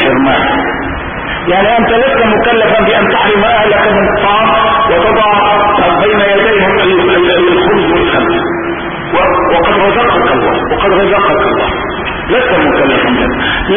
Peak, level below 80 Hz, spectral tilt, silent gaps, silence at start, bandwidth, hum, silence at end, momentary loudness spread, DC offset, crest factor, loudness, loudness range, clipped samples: 0 dBFS; -30 dBFS; -9.5 dB/octave; none; 0 s; 3.7 kHz; none; 0 s; 6 LU; 0.6%; 10 dB; -9 LUFS; 2 LU; under 0.1%